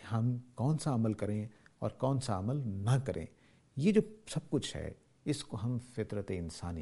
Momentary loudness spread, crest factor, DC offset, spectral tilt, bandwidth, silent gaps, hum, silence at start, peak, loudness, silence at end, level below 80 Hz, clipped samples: 10 LU; 20 dB; under 0.1%; -7 dB/octave; 11.5 kHz; none; none; 0 s; -14 dBFS; -35 LUFS; 0 s; -58 dBFS; under 0.1%